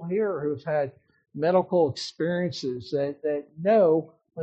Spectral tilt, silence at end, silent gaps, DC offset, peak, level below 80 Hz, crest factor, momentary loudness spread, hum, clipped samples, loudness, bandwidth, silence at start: -5.5 dB/octave; 0 s; none; under 0.1%; -8 dBFS; -70 dBFS; 16 dB; 10 LU; none; under 0.1%; -26 LUFS; 8 kHz; 0 s